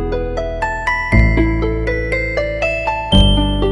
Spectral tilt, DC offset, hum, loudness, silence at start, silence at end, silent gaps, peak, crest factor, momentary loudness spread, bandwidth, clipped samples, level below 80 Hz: -6.5 dB/octave; under 0.1%; none; -16 LUFS; 0 s; 0 s; none; 0 dBFS; 16 dB; 8 LU; 10.5 kHz; under 0.1%; -20 dBFS